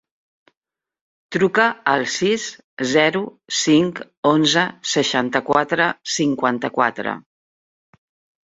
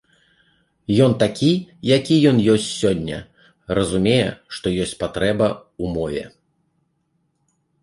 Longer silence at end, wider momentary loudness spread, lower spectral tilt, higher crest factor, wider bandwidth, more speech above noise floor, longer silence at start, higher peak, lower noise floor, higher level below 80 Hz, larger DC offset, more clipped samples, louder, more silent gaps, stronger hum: second, 1.25 s vs 1.55 s; second, 10 LU vs 13 LU; second, -3.5 dB/octave vs -6 dB/octave; about the same, 20 dB vs 18 dB; second, 8 kHz vs 11.5 kHz; first, over 71 dB vs 50 dB; first, 1.3 s vs 0.9 s; about the same, 0 dBFS vs -2 dBFS; first, under -90 dBFS vs -68 dBFS; second, -62 dBFS vs -46 dBFS; neither; neither; about the same, -19 LUFS vs -19 LUFS; first, 2.64-2.77 s, 4.17-4.23 s vs none; neither